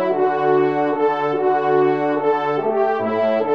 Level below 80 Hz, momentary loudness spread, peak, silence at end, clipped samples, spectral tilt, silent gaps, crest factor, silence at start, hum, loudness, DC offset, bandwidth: -72 dBFS; 2 LU; -6 dBFS; 0 s; under 0.1%; -8 dB/octave; none; 12 dB; 0 s; none; -18 LUFS; 0.3%; 6 kHz